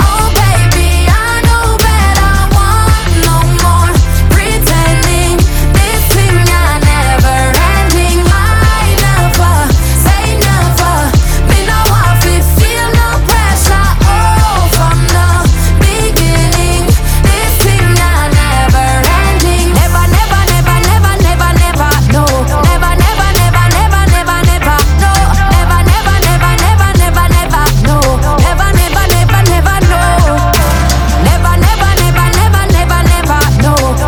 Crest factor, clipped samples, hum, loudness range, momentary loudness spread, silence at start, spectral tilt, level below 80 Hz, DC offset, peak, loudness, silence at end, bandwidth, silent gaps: 8 dB; 0.2%; none; 0 LU; 1 LU; 0 s; -4.5 dB/octave; -12 dBFS; under 0.1%; 0 dBFS; -9 LUFS; 0 s; over 20 kHz; none